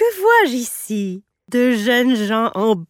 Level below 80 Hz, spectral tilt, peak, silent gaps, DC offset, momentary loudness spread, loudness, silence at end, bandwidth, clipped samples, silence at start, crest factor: -66 dBFS; -4 dB/octave; -2 dBFS; none; under 0.1%; 11 LU; -17 LUFS; 0.05 s; 17.5 kHz; under 0.1%; 0 s; 14 dB